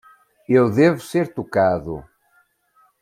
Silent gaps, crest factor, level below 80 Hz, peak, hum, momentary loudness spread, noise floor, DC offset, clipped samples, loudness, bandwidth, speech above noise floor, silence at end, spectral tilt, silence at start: none; 18 dB; -54 dBFS; -4 dBFS; none; 12 LU; -61 dBFS; under 0.1%; under 0.1%; -19 LUFS; 15.5 kHz; 43 dB; 1 s; -7.5 dB/octave; 0.5 s